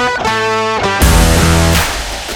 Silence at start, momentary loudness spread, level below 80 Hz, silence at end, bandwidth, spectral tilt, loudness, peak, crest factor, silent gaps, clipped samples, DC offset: 0 s; 5 LU; -18 dBFS; 0 s; 19.5 kHz; -4 dB/octave; -11 LUFS; 0 dBFS; 12 dB; none; under 0.1%; under 0.1%